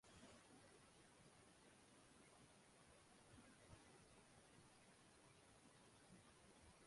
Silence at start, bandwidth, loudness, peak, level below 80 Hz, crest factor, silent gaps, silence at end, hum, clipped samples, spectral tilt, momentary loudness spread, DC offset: 0.05 s; 11.5 kHz; -69 LUFS; -52 dBFS; -82 dBFS; 18 dB; none; 0 s; none; under 0.1%; -3.5 dB/octave; 3 LU; under 0.1%